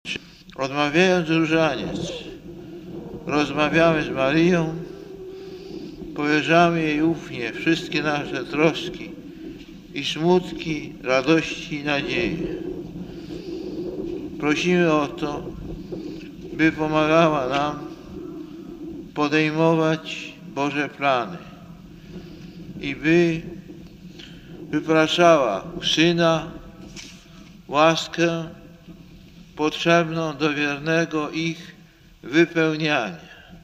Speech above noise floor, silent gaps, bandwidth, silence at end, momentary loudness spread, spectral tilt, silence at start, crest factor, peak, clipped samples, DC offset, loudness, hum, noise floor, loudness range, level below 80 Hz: 29 dB; none; 15 kHz; 0.05 s; 20 LU; -5.5 dB/octave; 0.05 s; 22 dB; -2 dBFS; under 0.1%; under 0.1%; -21 LUFS; none; -50 dBFS; 4 LU; -50 dBFS